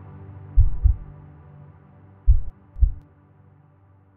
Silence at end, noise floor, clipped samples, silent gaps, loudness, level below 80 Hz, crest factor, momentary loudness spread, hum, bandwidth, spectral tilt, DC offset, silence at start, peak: 1.15 s; -55 dBFS; under 0.1%; none; -25 LUFS; -24 dBFS; 20 dB; 24 LU; none; 1.9 kHz; -12.5 dB/octave; under 0.1%; 0.2 s; -4 dBFS